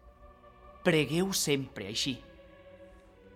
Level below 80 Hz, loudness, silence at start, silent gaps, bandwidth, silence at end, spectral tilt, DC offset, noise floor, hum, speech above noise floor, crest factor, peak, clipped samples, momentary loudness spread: -58 dBFS; -30 LUFS; 0.05 s; none; 16.5 kHz; 0.05 s; -4 dB/octave; under 0.1%; -55 dBFS; none; 25 dB; 22 dB; -12 dBFS; under 0.1%; 7 LU